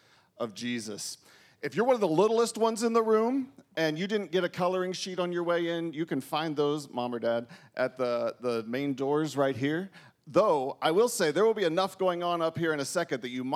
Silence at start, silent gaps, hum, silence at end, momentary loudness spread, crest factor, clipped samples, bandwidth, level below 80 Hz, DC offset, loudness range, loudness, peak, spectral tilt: 0.4 s; none; none; 0 s; 9 LU; 18 dB; under 0.1%; 15.5 kHz; -82 dBFS; under 0.1%; 4 LU; -29 LUFS; -10 dBFS; -4.5 dB/octave